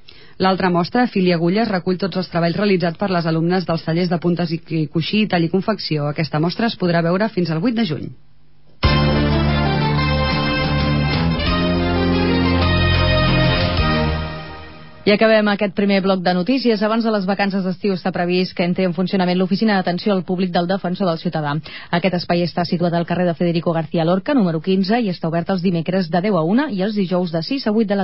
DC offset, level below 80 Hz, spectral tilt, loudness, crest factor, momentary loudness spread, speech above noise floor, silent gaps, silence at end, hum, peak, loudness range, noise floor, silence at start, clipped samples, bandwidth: 0.8%; -32 dBFS; -11 dB/octave; -18 LUFS; 14 dB; 5 LU; 36 dB; none; 0 s; none; -4 dBFS; 3 LU; -54 dBFS; 0.4 s; under 0.1%; 5.8 kHz